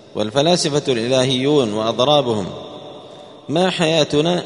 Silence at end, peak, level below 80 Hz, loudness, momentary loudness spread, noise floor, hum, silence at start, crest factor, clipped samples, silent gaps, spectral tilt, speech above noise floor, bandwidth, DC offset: 0 s; 0 dBFS; -54 dBFS; -17 LUFS; 19 LU; -39 dBFS; none; 0.15 s; 18 dB; under 0.1%; none; -4.5 dB/octave; 22 dB; 11 kHz; under 0.1%